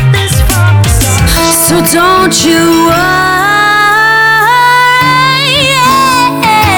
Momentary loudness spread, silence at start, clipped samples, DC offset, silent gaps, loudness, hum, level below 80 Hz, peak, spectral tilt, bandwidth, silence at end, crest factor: 3 LU; 0 s; 0.9%; under 0.1%; none; -6 LUFS; none; -20 dBFS; 0 dBFS; -3.5 dB/octave; over 20 kHz; 0 s; 6 dB